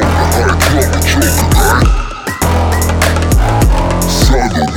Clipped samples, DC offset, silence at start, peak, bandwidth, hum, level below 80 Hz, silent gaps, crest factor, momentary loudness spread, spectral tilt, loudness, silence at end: under 0.1%; under 0.1%; 0 s; 0 dBFS; 17.5 kHz; none; -14 dBFS; none; 10 dB; 3 LU; -4.5 dB/octave; -11 LUFS; 0 s